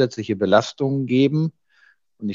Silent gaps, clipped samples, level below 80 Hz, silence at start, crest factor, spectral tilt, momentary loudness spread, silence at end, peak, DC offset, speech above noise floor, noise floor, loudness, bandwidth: none; under 0.1%; -68 dBFS; 0 s; 18 dB; -7 dB/octave; 8 LU; 0 s; -2 dBFS; under 0.1%; 39 dB; -58 dBFS; -20 LUFS; 7.6 kHz